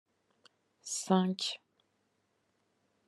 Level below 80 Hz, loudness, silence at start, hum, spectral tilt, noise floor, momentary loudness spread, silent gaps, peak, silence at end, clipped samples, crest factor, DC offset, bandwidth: -86 dBFS; -33 LUFS; 0.85 s; none; -4.5 dB/octave; -78 dBFS; 17 LU; none; -12 dBFS; 1.5 s; under 0.1%; 26 dB; under 0.1%; 12.5 kHz